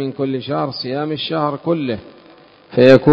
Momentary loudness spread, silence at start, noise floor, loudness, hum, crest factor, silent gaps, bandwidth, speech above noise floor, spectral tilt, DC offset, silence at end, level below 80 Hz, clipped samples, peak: 12 LU; 0 s; -45 dBFS; -18 LUFS; none; 16 dB; none; 8 kHz; 30 dB; -8 dB/octave; under 0.1%; 0 s; -54 dBFS; 0.3%; 0 dBFS